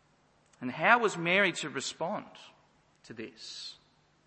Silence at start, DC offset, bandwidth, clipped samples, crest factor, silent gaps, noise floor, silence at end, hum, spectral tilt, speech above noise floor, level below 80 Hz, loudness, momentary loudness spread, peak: 0.6 s; under 0.1%; 8.8 kHz; under 0.1%; 26 dB; none; -67 dBFS; 0.55 s; none; -3.5 dB/octave; 36 dB; -80 dBFS; -29 LUFS; 20 LU; -6 dBFS